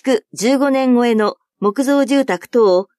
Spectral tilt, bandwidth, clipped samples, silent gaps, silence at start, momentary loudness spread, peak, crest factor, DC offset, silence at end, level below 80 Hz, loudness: -5 dB/octave; 13.5 kHz; under 0.1%; none; 0.05 s; 6 LU; -4 dBFS; 12 dB; under 0.1%; 0.15 s; -70 dBFS; -16 LUFS